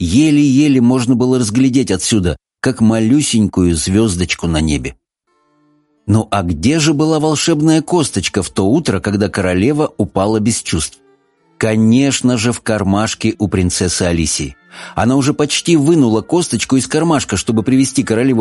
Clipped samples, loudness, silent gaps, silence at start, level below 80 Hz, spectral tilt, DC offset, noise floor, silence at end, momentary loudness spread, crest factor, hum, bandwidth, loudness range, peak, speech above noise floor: under 0.1%; -14 LUFS; none; 0 s; -36 dBFS; -5 dB/octave; under 0.1%; -61 dBFS; 0 s; 6 LU; 12 dB; none; 11.5 kHz; 3 LU; 0 dBFS; 48 dB